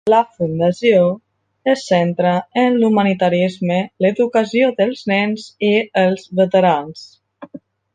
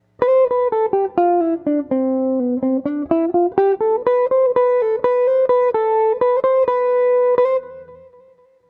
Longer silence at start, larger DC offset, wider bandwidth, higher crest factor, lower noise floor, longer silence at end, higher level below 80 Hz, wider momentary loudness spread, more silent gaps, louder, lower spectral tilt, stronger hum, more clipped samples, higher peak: second, 0.05 s vs 0.2 s; neither; first, 9.4 kHz vs 4.2 kHz; about the same, 14 dB vs 14 dB; second, -40 dBFS vs -51 dBFS; second, 0.4 s vs 0.75 s; about the same, -60 dBFS vs -60 dBFS; first, 7 LU vs 4 LU; neither; about the same, -16 LUFS vs -17 LUFS; second, -6.5 dB/octave vs -9 dB/octave; neither; neither; about the same, -2 dBFS vs -2 dBFS